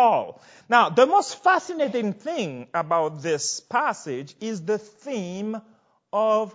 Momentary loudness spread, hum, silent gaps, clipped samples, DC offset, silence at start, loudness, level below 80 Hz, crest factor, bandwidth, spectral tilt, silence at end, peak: 13 LU; none; none; under 0.1%; under 0.1%; 0 s; -24 LUFS; -80 dBFS; 22 dB; 8 kHz; -4 dB/octave; 0.05 s; -2 dBFS